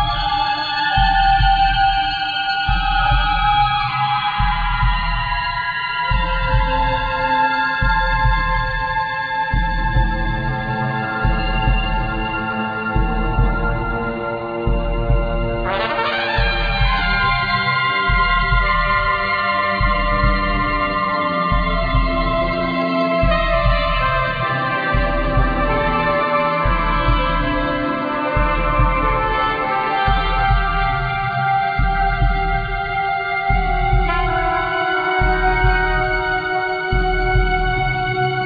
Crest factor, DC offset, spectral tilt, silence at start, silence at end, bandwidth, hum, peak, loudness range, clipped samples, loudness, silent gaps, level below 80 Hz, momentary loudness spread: 14 dB; under 0.1%; -7.5 dB/octave; 0 s; 0 s; 5 kHz; none; -4 dBFS; 4 LU; under 0.1%; -18 LUFS; none; -22 dBFS; 5 LU